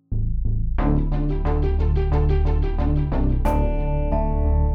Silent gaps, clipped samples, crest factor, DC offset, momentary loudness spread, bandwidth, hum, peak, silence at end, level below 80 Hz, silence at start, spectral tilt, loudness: none; under 0.1%; 12 dB; under 0.1%; 4 LU; 4.6 kHz; none; -8 dBFS; 0 s; -20 dBFS; 0.1 s; -10 dB/octave; -23 LUFS